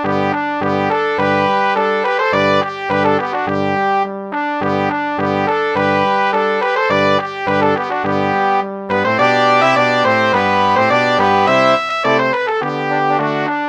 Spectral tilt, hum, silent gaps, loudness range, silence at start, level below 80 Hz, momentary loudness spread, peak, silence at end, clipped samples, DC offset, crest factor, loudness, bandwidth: -5.5 dB/octave; none; none; 4 LU; 0 s; -62 dBFS; 6 LU; 0 dBFS; 0 s; under 0.1%; under 0.1%; 14 dB; -15 LUFS; 9.6 kHz